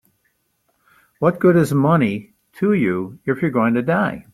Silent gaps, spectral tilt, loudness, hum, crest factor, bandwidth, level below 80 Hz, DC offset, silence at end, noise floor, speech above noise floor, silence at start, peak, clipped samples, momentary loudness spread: none; -8 dB/octave; -18 LUFS; none; 16 dB; 14.5 kHz; -56 dBFS; under 0.1%; 0.1 s; -67 dBFS; 50 dB; 1.2 s; -2 dBFS; under 0.1%; 8 LU